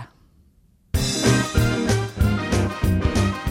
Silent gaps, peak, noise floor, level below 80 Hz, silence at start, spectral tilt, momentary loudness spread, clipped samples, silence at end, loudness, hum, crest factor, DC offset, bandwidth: none; -4 dBFS; -57 dBFS; -30 dBFS; 0 s; -5 dB/octave; 4 LU; under 0.1%; 0 s; -21 LUFS; none; 18 dB; under 0.1%; 17 kHz